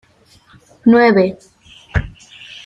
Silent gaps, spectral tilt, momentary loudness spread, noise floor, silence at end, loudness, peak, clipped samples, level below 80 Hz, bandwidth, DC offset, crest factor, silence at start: none; -7.5 dB/octave; 21 LU; -50 dBFS; 0.05 s; -14 LUFS; -2 dBFS; under 0.1%; -34 dBFS; 7.8 kHz; under 0.1%; 16 dB; 0.85 s